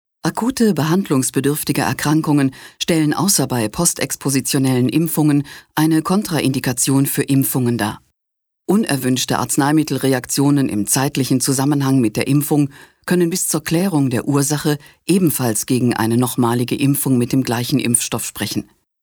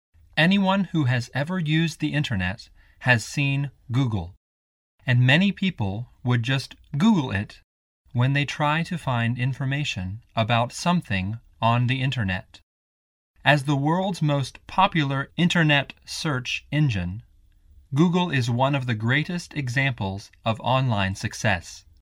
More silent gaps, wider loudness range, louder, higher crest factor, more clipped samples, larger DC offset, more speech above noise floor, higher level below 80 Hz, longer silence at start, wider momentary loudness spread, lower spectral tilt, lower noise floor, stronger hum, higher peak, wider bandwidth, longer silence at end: second, none vs 4.37-4.98 s, 7.64-8.05 s, 12.63-13.34 s; about the same, 1 LU vs 2 LU; first, -17 LUFS vs -24 LUFS; about the same, 18 dB vs 22 dB; neither; neither; first, 60 dB vs 32 dB; about the same, -52 dBFS vs -52 dBFS; about the same, 0.25 s vs 0.35 s; second, 5 LU vs 10 LU; second, -4.5 dB/octave vs -6 dB/octave; first, -77 dBFS vs -55 dBFS; neither; about the same, 0 dBFS vs -2 dBFS; first, over 20 kHz vs 12.5 kHz; first, 0.4 s vs 0.2 s